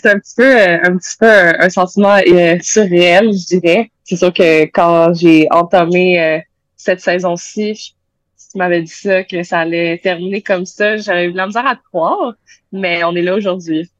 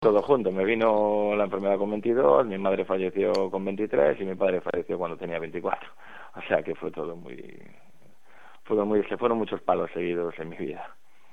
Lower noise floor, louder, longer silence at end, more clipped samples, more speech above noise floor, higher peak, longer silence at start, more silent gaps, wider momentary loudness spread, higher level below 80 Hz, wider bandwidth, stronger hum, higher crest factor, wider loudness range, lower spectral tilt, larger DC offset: second, -50 dBFS vs -60 dBFS; first, -12 LUFS vs -26 LUFS; second, 0.15 s vs 0.45 s; neither; first, 39 dB vs 34 dB; first, 0 dBFS vs -6 dBFS; about the same, 0.05 s vs 0 s; neither; second, 11 LU vs 15 LU; first, -54 dBFS vs -64 dBFS; about the same, 9.8 kHz vs 9 kHz; neither; second, 12 dB vs 20 dB; about the same, 8 LU vs 9 LU; second, -5 dB/octave vs -7.5 dB/octave; second, under 0.1% vs 0.6%